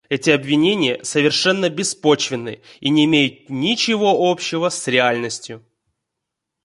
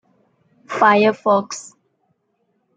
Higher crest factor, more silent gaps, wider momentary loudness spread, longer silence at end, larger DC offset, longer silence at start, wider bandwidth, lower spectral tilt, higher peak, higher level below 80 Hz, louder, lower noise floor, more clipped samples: about the same, 18 dB vs 18 dB; neither; second, 9 LU vs 18 LU; about the same, 1.05 s vs 1.15 s; neither; second, 0.1 s vs 0.7 s; first, 11.5 kHz vs 9.4 kHz; about the same, -4 dB/octave vs -4.5 dB/octave; about the same, -2 dBFS vs -2 dBFS; first, -62 dBFS vs -72 dBFS; about the same, -17 LUFS vs -16 LUFS; first, -81 dBFS vs -68 dBFS; neither